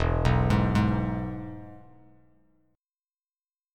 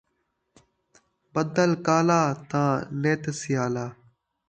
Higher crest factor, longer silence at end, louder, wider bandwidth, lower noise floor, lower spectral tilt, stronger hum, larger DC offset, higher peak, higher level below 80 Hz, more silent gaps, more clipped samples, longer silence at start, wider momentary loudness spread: about the same, 20 dB vs 20 dB; first, 1.95 s vs 0.55 s; about the same, -26 LUFS vs -25 LUFS; about the same, 10 kHz vs 9.2 kHz; first, under -90 dBFS vs -75 dBFS; first, -8 dB/octave vs -6 dB/octave; neither; neither; about the same, -8 dBFS vs -8 dBFS; first, -36 dBFS vs -64 dBFS; neither; neither; second, 0 s vs 1.35 s; first, 19 LU vs 9 LU